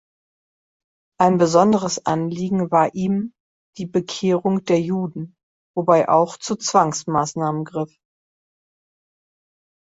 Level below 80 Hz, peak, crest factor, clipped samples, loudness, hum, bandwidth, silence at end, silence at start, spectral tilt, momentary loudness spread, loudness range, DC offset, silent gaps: -62 dBFS; -2 dBFS; 18 dB; under 0.1%; -20 LUFS; none; 8 kHz; 2.15 s; 1.2 s; -5.5 dB/octave; 14 LU; 4 LU; under 0.1%; 3.40-3.73 s, 5.43-5.74 s